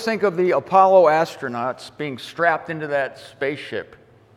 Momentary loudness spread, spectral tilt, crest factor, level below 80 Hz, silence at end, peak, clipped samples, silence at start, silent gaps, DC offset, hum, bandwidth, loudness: 16 LU; -5.5 dB/octave; 18 dB; -66 dBFS; 0.5 s; -2 dBFS; under 0.1%; 0 s; none; under 0.1%; none; 13 kHz; -20 LUFS